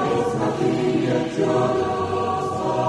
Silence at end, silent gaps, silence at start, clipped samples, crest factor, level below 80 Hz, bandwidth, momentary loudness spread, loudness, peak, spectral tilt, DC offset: 0 s; none; 0 s; under 0.1%; 12 dB; -52 dBFS; 11.5 kHz; 3 LU; -22 LUFS; -8 dBFS; -6.5 dB/octave; under 0.1%